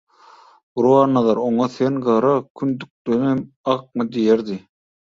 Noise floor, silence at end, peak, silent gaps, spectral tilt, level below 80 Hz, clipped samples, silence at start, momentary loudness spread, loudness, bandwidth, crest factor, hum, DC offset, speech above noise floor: -49 dBFS; 0.5 s; -2 dBFS; 2.50-2.55 s, 2.90-3.05 s, 3.56-3.64 s; -8 dB/octave; -62 dBFS; under 0.1%; 0.75 s; 10 LU; -19 LUFS; 7.6 kHz; 16 dB; none; under 0.1%; 30 dB